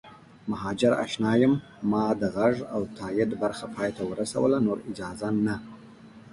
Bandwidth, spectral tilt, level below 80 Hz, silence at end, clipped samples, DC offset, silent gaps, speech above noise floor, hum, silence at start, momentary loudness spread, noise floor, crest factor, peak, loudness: 11.5 kHz; -6.5 dB/octave; -58 dBFS; 0.05 s; under 0.1%; under 0.1%; none; 22 dB; none; 0.05 s; 10 LU; -49 dBFS; 18 dB; -10 dBFS; -27 LUFS